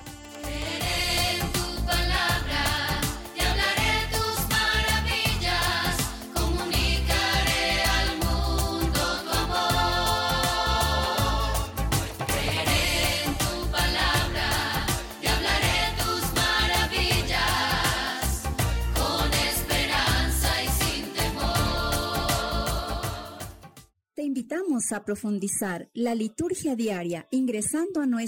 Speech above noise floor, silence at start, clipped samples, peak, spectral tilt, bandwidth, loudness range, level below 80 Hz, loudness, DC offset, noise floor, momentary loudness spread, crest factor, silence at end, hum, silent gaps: 26 dB; 0 s; under 0.1%; -10 dBFS; -3.5 dB/octave; 19 kHz; 5 LU; -32 dBFS; -25 LUFS; under 0.1%; -54 dBFS; 7 LU; 16 dB; 0 s; none; none